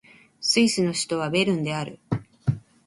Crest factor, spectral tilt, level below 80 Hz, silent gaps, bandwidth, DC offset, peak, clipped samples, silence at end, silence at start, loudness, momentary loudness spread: 18 dB; -4.5 dB/octave; -56 dBFS; none; 11.5 kHz; under 0.1%; -8 dBFS; under 0.1%; 0.3 s; 0.4 s; -24 LUFS; 11 LU